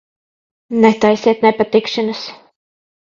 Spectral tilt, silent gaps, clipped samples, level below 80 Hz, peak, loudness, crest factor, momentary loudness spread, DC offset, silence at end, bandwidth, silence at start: -5.5 dB/octave; none; under 0.1%; -58 dBFS; 0 dBFS; -14 LUFS; 16 dB; 12 LU; under 0.1%; 0.8 s; 7.4 kHz; 0.7 s